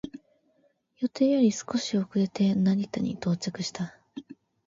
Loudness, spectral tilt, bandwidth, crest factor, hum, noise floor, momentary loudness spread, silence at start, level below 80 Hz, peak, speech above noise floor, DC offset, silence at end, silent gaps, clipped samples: -27 LUFS; -6 dB/octave; 7.8 kHz; 16 dB; none; -68 dBFS; 16 LU; 0.05 s; -66 dBFS; -12 dBFS; 42 dB; under 0.1%; 0.35 s; none; under 0.1%